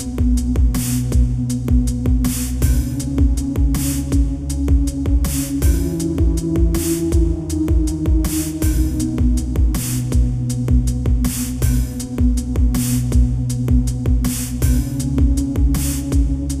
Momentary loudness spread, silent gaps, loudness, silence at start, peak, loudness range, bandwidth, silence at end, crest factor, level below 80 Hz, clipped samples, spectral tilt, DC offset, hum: 3 LU; none; -19 LUFS; 0 s; -4 dBFS; 1 LU; 15.5 kHz; 0 s; 12 dB; -18 dBFS; under 0.1%; -6 dB/octave; under 0.1%; none